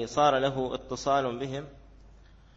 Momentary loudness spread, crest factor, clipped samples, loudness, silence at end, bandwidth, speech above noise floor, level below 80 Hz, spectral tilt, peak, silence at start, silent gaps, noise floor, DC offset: 13 LU; 18 dB; under 0.1%; -28 LUFS; 0.45 s; 8 kHz; 26 dB; -54 dBFS; -5 dB/octave; -10 dBFS; 0 s; none; -54 dBFS; under 0.1%